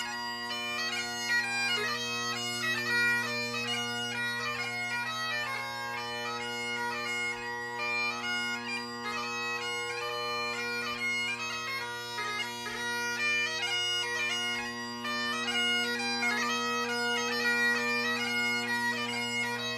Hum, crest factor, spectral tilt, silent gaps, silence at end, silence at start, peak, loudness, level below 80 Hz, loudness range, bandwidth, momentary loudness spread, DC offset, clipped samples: none; 16 dB; -1.5 dB/octave; none; 0 s; 0 s; -16 dBFS; -30 LUFS; -70 dBFS; 4 LU; 15.5 kHz; 7 LU; under 0.1%; under 0.1%